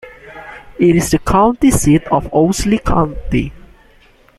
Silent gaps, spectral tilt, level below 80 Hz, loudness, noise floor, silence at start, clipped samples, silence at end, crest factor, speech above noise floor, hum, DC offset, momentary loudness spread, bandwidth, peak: none; -6 dB/octave; -28 dBFS; -14 LUFS; -48 dBFS; 0.05 s; under 0.1%; 0.8 s; 14 dB; 35 dB; none; under 0.1%; 21 LU; 15.5 kHz; -2 dBFS